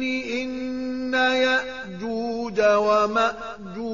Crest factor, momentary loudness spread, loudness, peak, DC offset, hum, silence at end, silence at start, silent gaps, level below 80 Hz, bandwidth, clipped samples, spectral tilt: 16 dB; 13 LU; -23 LUFS; -8 dBFS; 0.4%; none; 0 s; 0 s; none; -56 dBFS; 7.2 kHz; under 0.1%; -1.5 dB/octave